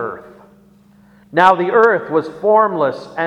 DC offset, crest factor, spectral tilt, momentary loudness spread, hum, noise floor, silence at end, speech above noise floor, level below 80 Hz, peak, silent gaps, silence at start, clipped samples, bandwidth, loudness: under 0.1%; 16 dB; -6.5 dB/octave; 9 LU; 60 Hz at -45 dBFS; -48 dBFS; 0 s; 34 dB; -60 dBFS; 0 dBFS; none; 0 s; under 0.1%; 8.8 kHz; -14 LUFS